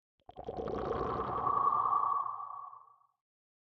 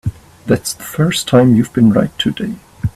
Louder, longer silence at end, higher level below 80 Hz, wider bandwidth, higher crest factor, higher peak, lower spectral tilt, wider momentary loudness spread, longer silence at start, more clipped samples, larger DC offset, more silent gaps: second, -33 LUFS vs -14 LUFS; first, 0.85 s vs 0.05 s; second, -58 dBFS vs -40 dBFS; second, 6.2 kHz vs 14.5 kHz; about the same, 16 dB vs 14 dB; second, -20 dBFS vs 0 dBFS; first, -8 dB/octave vs -6 dB/octave; about the same, 16 LU vs 14 LU; first, 0.35 s vs 0.05 s; neither; neither; neither